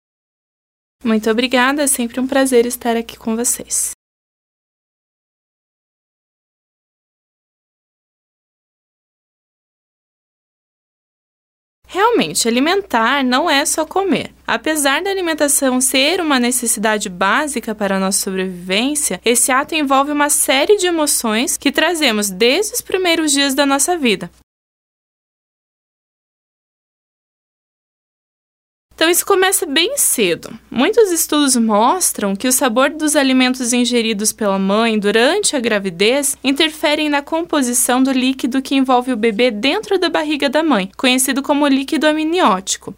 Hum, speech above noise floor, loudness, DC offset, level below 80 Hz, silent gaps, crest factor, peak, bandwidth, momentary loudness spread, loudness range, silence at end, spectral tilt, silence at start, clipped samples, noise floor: none; over 75 dB; -15 LUFS; under 0.1%; -54 dBFS; 3.94-11.82 s, 24.43-28.89 s; 18 dB; 0 dBFS; 16.5 kHz; 5 LU; 6 LU; 0.05 s; -2 dB/octave; 1.05 s; under 0.1%; under -90 dBFS